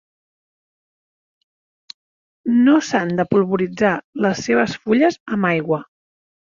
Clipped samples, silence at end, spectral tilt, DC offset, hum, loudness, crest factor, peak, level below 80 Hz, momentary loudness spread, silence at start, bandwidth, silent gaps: under 0.1%; 0.65 s; -6 dB/octave; under 0.1%; none; -18 LUFS; 18 dB; -2 dBFS; -58 dBFS; 7 LU; 2.45 s; 7.4 kHz; 4.04-4.13 s, 5.20-5.26 s